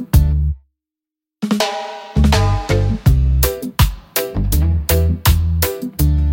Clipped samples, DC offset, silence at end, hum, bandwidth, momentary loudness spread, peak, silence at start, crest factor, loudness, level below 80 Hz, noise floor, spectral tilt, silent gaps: under 0.1%; under 0.1%; 0 s; none; 17 kHz; 7 LU; 0 dBFS; 0 s; 14 dB; -17 LUFS; -20 dBFS; -87 dBFS; -5.5 dB/octave; none